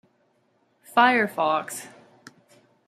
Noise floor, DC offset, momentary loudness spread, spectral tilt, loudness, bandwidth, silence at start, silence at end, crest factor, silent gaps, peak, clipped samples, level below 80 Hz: -67 dBFS; under 0.1%; 18 LU; -3 dB/octave; -22 LUFS; 15.5 kHz; 0.95 s; 1 s; 22 dB; none; -4 dBFS; under 0.1%; -80 dBFS